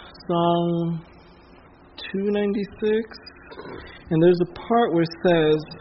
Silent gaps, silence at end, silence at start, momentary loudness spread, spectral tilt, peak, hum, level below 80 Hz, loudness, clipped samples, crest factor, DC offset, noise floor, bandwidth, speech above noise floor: none; 0 s; 0 s; 20 LU; -6 dB/octave; -8 dBFS; none; -54 dBFS; -22 LUFS; under 0.1%; 16 dB; under 0.1%; -49 dBFS; 5.8 kHz; 28 dB